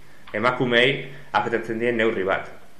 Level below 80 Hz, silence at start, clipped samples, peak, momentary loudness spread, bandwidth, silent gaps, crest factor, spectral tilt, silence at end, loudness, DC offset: -58 dBFS; 0.25 s; under 0.1%; -6 dBFS; 9 LU; 12 kHz; none; 18 dB; -5.5 dB/octave; 0.25 s; -22 LUFS; 1%